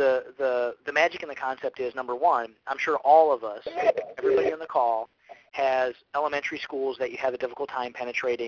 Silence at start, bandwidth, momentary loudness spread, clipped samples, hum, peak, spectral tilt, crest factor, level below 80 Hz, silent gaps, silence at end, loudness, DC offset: 0 s; 7.2 kHz; 8 LU; under 0.1%; none; -6 dBFS; -4 dB/octave; 20 dB; -68 dBFS; none; 0 s; -26 LUFS; under 0.1%